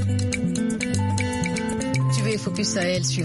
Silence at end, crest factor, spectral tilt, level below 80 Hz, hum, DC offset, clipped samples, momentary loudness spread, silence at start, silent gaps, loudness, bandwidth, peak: 0 s; 14 dB; -5 dB/octave; -46 dBFS; none; under 0.1%; under 0.1%; 3 LU; 0 s; none; -24 LUFS; 11.5 kHz; -10 dBFS